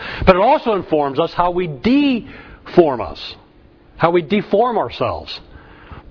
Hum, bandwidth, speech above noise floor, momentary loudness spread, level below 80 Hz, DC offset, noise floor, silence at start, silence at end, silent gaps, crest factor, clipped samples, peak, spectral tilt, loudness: none; 5.4 kHz; 31 dB; 17 LU; -38 dBFS; under 0.1%; -47 dBFS; 0 s; 0.1 s; none; 18 dB; under 0.1%; 0 dBFS; -8 dB/octave; -17 LUFS